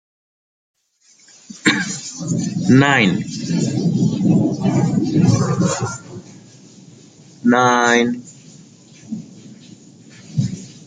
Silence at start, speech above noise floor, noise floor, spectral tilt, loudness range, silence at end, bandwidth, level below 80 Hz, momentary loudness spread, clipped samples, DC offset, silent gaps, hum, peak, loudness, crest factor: 1.5 s; 38 dB; -54 dBFS; -5.5 dB/octave; 3 LU; 0.1 s; 9.4 kHz; -54 dBFS; 17 LU; under 0.1%; under 0.1%; none; none; 0 dBFS; -17 LUFS; 18 dB